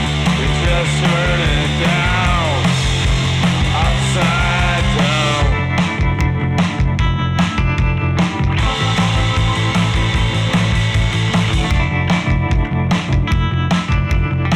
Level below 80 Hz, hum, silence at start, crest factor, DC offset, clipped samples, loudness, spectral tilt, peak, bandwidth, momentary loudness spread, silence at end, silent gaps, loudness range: -22 dBFS; none; 0 s; 10 dB; 0.3%; under 0.1%; -16 LUFS; -5.5 dB/octave; -6 dBFS; 12.5 kHz; 2 LU; 0 s; none; 1 LU